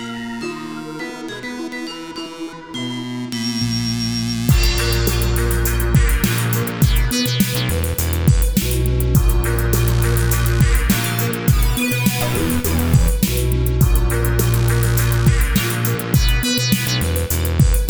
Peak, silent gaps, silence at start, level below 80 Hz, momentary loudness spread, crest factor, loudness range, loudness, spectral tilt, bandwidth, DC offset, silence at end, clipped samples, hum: -2 dBFS; none; 0 s; -22 dBFS; 11 LU; 14 dB; 6 LU; -18 LUFS; -5 dB/octave; over 20 kHz; under 0.1%; 0 s; under 0.1%; none